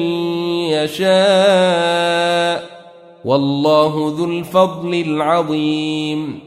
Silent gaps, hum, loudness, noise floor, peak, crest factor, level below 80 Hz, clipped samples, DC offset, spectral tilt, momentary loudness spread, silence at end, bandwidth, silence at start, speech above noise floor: none; none; -16 LUFS; -40 dBFS; -2 dBFS; 14 dB; -60 dBFS; under 0.1%; under 0.1%; -5.5 dB/octave; 8 LU; 0 s; 15 kHz; 0 s; 25 dB